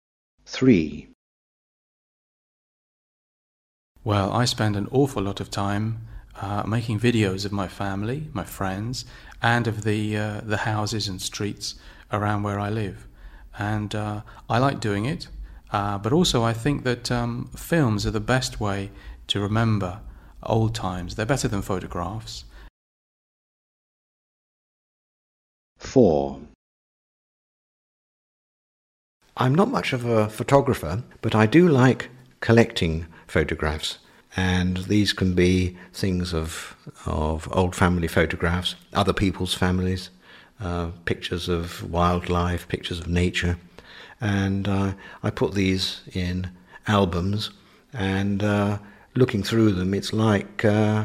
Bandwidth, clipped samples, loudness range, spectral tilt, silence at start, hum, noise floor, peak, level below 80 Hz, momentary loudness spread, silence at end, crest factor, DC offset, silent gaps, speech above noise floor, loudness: 15 kHz; under 0.1%; 7 LU; -6 dB/octave; 0.5 s; none; -45 dBFS; -2 dBFS; -42 dBFS; 13 LU; 0 s; 22 dB; under 0.1%; 1.15-3.95 s, 22.70-25.76 s, 26.55-29.20 s; 22 dB; -24 LUFS